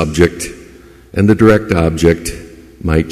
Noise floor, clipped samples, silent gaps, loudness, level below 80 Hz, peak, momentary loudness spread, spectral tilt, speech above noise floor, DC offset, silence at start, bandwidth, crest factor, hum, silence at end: -39 dBFS; under 0.1%; none; -13 LUFS; -28 dBFS; 0 dBFS; 15 LU; -6.5 dB/octave; 27 dB; under 0.1%; 0 s; 14.5 kHz; 14 dB; none; 0 s